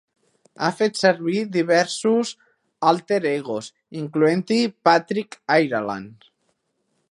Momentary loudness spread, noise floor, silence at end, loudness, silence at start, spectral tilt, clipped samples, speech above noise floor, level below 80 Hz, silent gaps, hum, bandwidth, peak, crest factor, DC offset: 11 LU; -72 dBFS; 0.95 s; -21 LUFS; 0.6 s; -5 dB/octave; under 0.1%; 51 dB; -72 dBFS; none; none; 11.5 kHz; 0 dBFS; 22 dB; under 0.1%